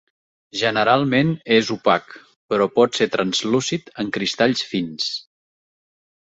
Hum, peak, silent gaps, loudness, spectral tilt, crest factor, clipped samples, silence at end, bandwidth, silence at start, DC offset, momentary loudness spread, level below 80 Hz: none; -2 dBFS; 2.36-2.49 s; -20 LUFS; -4.5 dB/octave; 20 dB; under 0.1%; 1.1 s; 8.2 kHz; 0.55 s; under 0.1%; 9 LU; -60 dBFS